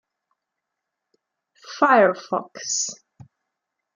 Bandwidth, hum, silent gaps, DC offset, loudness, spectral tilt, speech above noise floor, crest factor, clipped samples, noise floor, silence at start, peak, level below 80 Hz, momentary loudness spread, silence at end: 9.8 kHz; none; none; under 0.1%; -21 LUFS; -2.5 dB/octave; 62 dB; 22 dB; under 0.1%; -82 dBFS; 1.65 s; -2 dBFS; -78 dBFS; 13 LU; 1 s